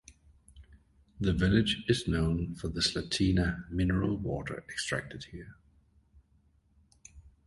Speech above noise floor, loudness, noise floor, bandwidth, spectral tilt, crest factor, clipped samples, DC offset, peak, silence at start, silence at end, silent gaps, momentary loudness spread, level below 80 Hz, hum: 37 dB; -31 LUFS; -67 dBFS; 11.5 kHz; -5.5 dB/octave; 20 dB; under 0.1%; under 0.1%; -12 dBFS; 0.1 s; 0.2 s; none; 14 LU; -44 dBFS; none